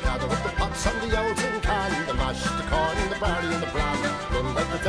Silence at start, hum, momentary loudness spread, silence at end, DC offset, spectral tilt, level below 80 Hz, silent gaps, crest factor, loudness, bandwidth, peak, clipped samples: 0 s; none; 2 LU; 0 s; under 0.1%; -4.5 dB/octave; -32 dBFS; none; 18 dB; -26 LUFS; 11 kHz; -8 dBFS; under 0.1%